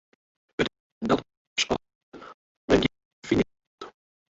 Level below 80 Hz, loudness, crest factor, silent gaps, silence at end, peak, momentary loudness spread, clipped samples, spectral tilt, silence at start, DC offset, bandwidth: -50 dBFS; -27 LUFS; 24 dB; 0.80-1.01 s, 1.37-1.56 s, 1.95-2.12 s, 2.34-2.68 s, 3.05-3.22 s, 3.67-3.78 s; 0.45 s; -6 dBFS; 22 LU; under 0.1%; -4.5 dB/octave; 0.6 s; under 0.1%; 8 kHz